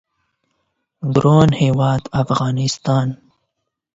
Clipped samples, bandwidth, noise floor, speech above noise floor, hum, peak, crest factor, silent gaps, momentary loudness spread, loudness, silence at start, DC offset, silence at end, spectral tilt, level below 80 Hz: under 0.1%; 8 kHz; -76 dBFS; 61 dB; none; 0 dBFS; 18 dB; none; 11 LU; -17 LUFS; 1 s; under 0.1%; 0.8 s; -7 dB/octave; -46 dBFS